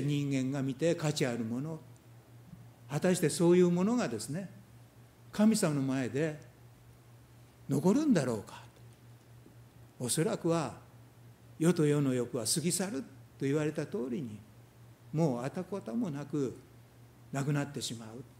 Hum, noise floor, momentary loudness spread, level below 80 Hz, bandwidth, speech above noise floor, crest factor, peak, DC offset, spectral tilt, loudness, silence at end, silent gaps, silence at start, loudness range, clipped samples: none; -57 dBFS; 15 LU; -70 dBFS; 16 kHz; 26 dB; 18 dB; -14 dBFS; under 0.1%; -5.5 dB/octave; -32 LUFS; 0.15 s; none; 0 s; 6 LU; under 0.1%